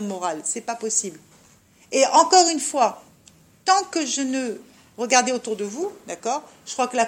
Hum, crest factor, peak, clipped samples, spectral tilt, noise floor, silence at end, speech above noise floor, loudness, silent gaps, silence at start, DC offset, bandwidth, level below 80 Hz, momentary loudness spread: none; 22 dB; -2 dBFS; under 0.1%; -1.5 dB/octave; -54 dBFS; 0 s; 33 dB; -21 LUFS; none; 0 s; under 0.1%; 16.5 kHz; -72 dBFS; 15 LU